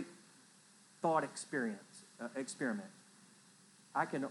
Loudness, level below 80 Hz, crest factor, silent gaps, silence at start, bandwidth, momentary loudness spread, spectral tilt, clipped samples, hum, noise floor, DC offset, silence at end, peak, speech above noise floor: -40 LUFS; under -90 dBFS; 22 dB; none; 0 s; 12 kHz; 26 LU; -4.5 dB/octave; under 0.1%; none; -64 dBFS; under 0.1%; 0 s; -20 dBFS; 26 dB